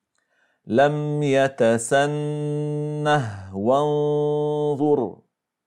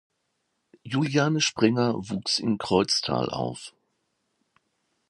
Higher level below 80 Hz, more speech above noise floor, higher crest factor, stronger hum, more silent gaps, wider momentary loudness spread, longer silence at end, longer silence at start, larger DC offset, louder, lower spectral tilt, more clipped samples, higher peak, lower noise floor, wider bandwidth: second, -68 dBFS vs -60 dBFS; second, 46 dB vs 51 dB; second, 16 dB vs 22 dB; neither; neither; about the same, 7 LU vs 9 LU; second, 0.5 s vs 1.4 s; second, 0.65 s vs 0.85 s; neither; first, -22 LUFS vs -25 LUFS; first, -6 dB/octave vs -4.5 dB/octave; neither; about the same, -6 dBFS vs -6 dBFS; second, -68 dBFS vs -76 dBFS; about the same, 12 kHz vs 11.5 kHz